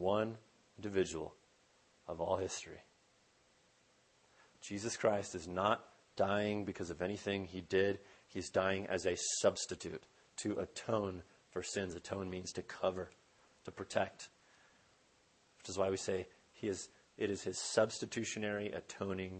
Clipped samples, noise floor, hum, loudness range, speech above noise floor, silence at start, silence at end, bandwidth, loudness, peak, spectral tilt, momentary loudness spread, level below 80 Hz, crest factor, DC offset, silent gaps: under 0.1%; -71 dBFS; none; 7 LU; 33 dB; 0 s; 0 s; 8.8 kHz; -39 LUFS; -16 dBFS; -4 dB/octave; 17 LU; -70 dBFS; 24 dB; under 0.1%; none